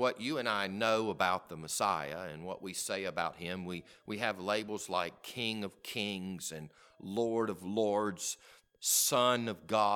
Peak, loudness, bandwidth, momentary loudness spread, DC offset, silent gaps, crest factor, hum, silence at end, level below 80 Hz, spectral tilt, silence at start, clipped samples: -14 dBFS; -34 LUFS; 19 kHz; 13 LU; under 0.1%; none; 22 dB; none; 0 s; -72 dBFS; -3 dB/octave; 0 s; under 0.1%